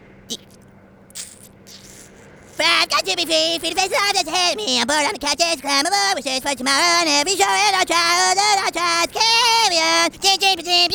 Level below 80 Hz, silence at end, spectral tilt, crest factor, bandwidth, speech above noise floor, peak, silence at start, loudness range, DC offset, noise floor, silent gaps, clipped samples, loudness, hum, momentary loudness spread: -56 dBFS; 0 s; 0 dB/octave; 18 dB; over 20 kHz; 29 dB; 0 dBFS; 0.3 s; 5 LU; under 0.1%; -47 dBFS; none; under 0.1%; -16 LUFS; none; 15 LU